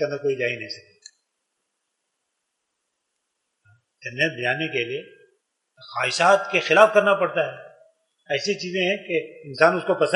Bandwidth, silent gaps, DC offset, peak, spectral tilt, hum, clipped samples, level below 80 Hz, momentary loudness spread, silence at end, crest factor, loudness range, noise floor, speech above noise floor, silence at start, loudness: 11.5 kHz; none; under 0.1%; 0 dBFS; -4 dB/octave; none; under 0.1%; -76 dBFS; 18 LU; 0 s; 24 dB; 12 LU; -78 dBFS; 56 dB; 0 s; -21 LUFS